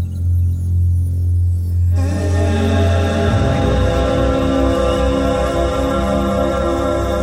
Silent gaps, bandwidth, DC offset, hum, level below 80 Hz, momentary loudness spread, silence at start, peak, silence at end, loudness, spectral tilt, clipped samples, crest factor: none; 12 kHz; under 0.1%; none; -24 dBFS; 2 LU; 0 s; -4 dBFS; 0 s; -16 LUFS; -7 dB/octave; under 0.1%; 12 dB